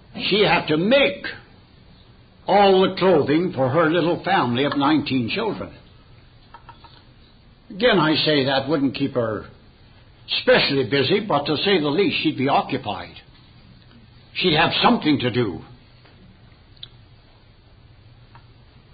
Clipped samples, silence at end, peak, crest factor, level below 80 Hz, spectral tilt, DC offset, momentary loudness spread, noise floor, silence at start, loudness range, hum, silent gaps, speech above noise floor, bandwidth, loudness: under 0.1%; 0.55 s; -4 dBFS; 18 dB; -52 dBFS; -10.5 dB/octave; under 0.1%; 16 LU; -50 dBFS; 0.15 s; 5 LU; none; none; 31 dB; 5 kHz; -19 LUFS